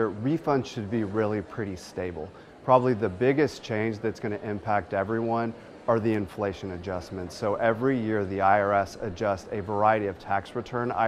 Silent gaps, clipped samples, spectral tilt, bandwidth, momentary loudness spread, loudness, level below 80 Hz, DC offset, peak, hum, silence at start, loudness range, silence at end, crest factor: none; under 0.1%; -7 dB/octave; 13.5 kHz; 11 LU; -27 LUFS; -58 dBFS; under 0.1%; -6 dBFS; none; 0 s; 3 LU; 0 s; 22 dB